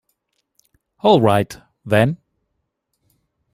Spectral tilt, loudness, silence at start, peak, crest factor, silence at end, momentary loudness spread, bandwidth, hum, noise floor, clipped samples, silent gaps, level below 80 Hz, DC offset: -7 dB/octave; -17 LUFS; 1.05 s; -2 dBFS; 20 dB; 1.4 s; 17 LU; 16 kHz; none; -74 dBFS; under 0.1%; none; -54 dBFS; under 0.1%